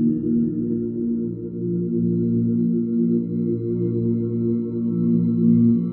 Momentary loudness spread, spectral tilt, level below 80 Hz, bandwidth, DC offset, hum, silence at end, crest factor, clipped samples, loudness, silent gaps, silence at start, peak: 7 LU; -15.5 dB/octave; -54 dBFS; 1.5 kHz; under 0.1%; none; 0 s; 14 dB; under 0.1%; -22 LUFS; none; 0 s; -6 dBFS